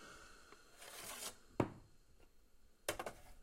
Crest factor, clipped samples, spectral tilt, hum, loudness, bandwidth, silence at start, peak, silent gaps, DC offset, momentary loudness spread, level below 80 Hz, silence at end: 30 dB; under 0.1%; -4 dB/octave; none; -46 LUFS; 16 kHz; 0 s; -18 dBFS; none; under 0.1%; 19 LU; -66 dBFS; 0 s